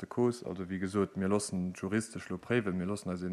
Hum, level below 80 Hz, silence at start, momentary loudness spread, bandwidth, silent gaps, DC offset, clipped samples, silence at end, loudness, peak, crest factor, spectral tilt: none; -66 dBFS; 0 s; 7 LU; 13 kHz; none; under 0.1%; under 0.1%; 0 s; -34 LUFS; -16 dBFS; 18 dB; -6 dB/octave